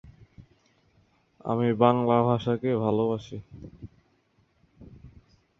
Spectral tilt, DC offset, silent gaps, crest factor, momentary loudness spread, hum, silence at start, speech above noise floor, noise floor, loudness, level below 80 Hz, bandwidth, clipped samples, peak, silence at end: -9 dB/octave; under 0.1%; none; 24 dB; 24 LU; none; 0.2 s; 42 dB; -67 dBFS; -25 LUFS; -58 dBFS; 6.6 kHz; under 0.1%; -4 dBFS; 0.5 s